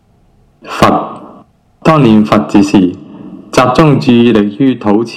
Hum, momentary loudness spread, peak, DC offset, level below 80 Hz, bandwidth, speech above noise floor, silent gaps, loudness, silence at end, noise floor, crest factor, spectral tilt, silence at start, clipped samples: none; 17 LU; 0 dBFS; under 0.1%; -38 dBFS; 14 kHz; 40 dB; none; -9 LUFS; 0 s; -48 dBFS; 10 dB; -7 dB/octave; 0.65 s; 1%